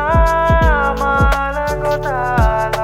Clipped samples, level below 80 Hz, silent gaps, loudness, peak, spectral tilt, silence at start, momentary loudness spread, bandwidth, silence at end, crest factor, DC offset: under 0.1%; -20 dBFS; none; -15 LUFS; -2 dBFS; -6.5 dB/octave; 0 s; 5 LU; 16 kHz; 0 s; 12 dB; under 0.1%